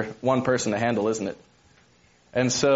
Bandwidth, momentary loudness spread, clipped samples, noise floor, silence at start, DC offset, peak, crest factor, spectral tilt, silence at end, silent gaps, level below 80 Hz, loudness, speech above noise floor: 8 kHz; 9 LU; under 0.1%; -59 dBFS; 0 s; under 0.1%; -8 dBFS; 18 dB; -4.5 dB/octave; 0 s; none; -60 dBFS; -25 LUFS; 36 dB